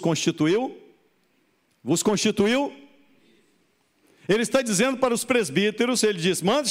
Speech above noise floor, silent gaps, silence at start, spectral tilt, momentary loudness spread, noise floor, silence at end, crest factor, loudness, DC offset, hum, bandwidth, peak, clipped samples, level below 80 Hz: 44 dB; none; 0 s; -4 dB/octave; 5 LU; -66 dBFS; 0 s; 16 dB; -23 LUFS; under 0.1%; none; 16 kHz; -8 dBFS; under 0.1%; -64 dBFS